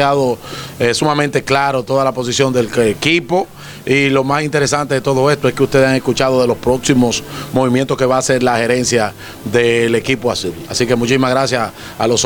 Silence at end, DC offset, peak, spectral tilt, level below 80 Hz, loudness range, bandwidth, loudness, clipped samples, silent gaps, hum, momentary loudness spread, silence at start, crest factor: 0 s; under 0.1%; 0 dBFS; -4.5 dB/octave; -44 dBFS; 1 LU; over 20 kHz; -14 LUFS; under 0.1%; none; none; 6 LU; 0 s; 14 dB